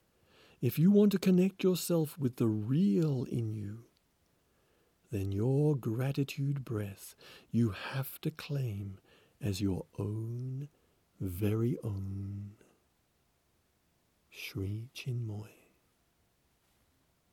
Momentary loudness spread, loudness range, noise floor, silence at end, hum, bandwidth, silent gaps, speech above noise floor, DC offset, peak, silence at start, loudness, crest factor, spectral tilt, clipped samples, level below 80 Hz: 15 LU; 14 LU; -74 dBFS; 1.85 s; none; 18.5 kHz; none; 42 dB; under 0.1%; -16 dBFS; 0.6 s; -33 LUFS; 18 dB; -7.5 dB/octave; under 0.1%; -68 dBFS